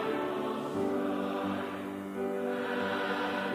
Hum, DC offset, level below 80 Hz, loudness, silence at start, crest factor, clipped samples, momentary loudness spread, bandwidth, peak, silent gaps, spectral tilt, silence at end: none; under 0.1%; -68 dBFS; -33 LUFS; 0 s; 14 dB; under 0.1%; 4 LU; 16 kHz; -20 dBFS; none; -6 dB/octave; 0 s